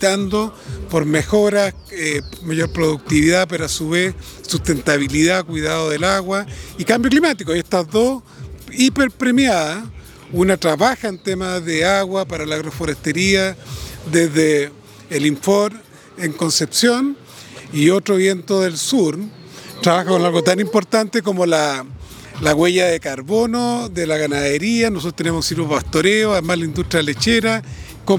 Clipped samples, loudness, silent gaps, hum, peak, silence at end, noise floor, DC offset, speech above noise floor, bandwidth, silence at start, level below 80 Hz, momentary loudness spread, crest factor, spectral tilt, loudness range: under 0.1%; -17 LUFS; none; none; 0 dBFS; 0 s; -37 dBFS; under 0.1%; 20 dB; 20 kHz; 0 s; -42 dBFS; 11 LU; 18 dB; -4.5 dB/octave; 2 LU